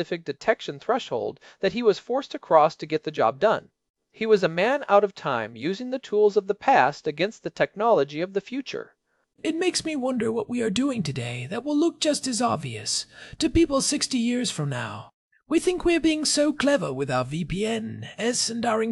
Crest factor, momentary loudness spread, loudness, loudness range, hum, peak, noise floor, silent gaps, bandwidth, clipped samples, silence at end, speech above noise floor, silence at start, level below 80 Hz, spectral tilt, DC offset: 20 dB; 10 LU; -24 LUFS; 3 LU; none; -4 dBFS; -65 dBFS; 3.90-3.94 s, 15.14-15.31 s; 12 kHz; under 0.1%; 0 s; 41 dB; 0 s; -50 dBFS; -4 dB/octave; under 0.1%